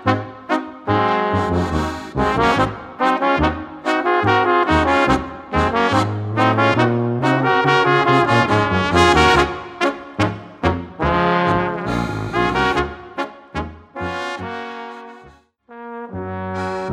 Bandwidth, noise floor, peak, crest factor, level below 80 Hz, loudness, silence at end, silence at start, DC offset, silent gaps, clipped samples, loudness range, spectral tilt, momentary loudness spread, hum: 13 kHz; -47 dBFS; 0 dBFS; 18 dB; -36 dBFS; -18 LUFS; 0 s; 0 s; under 0.1%; none; under 0.1%; 10 LU; -6 dB/octave; 14 LU; none